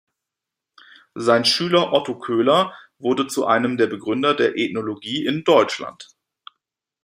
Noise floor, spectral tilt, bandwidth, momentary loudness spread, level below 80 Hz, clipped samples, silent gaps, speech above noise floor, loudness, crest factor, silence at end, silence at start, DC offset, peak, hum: -85 dBFS; -4.5 dB/octave; 16 kHz; 10 LU; -68 dBFS; under 0.1%; none; 65 dB; -20 LUFS; 20 dB; 1 s; 1.15 s; under 0.1%; -2 dBFS; none